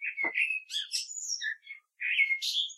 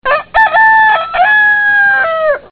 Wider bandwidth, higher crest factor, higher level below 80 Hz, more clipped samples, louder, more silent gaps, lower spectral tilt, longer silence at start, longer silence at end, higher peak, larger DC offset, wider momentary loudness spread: first, 14 kHz vs 5.2 kHz; first, 18 dB vs 10 dB; second, under -90 dBFS vs -42 dBFS; neither; second, -30 LUFS vs -8 LUFS; neither; second, 3.5 dB/octave vs -4 dB/octave; about the same, 0 s vs 0.05 s; about the same, 0 s vs 0.1 s; second, -16 dBFS vs 0 dBFS; neither; first, 10 LU vs 6 LU